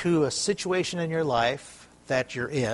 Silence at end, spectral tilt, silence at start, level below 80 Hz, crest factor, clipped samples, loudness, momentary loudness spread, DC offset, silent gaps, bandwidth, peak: 0 s; -4.5 dB/octave; 0 s; -58 dBFS; 18 dB; under 0.1%; -27 LUFS; 5 LU; under 0.1%; none; 11.5 kHz; -10 dBFS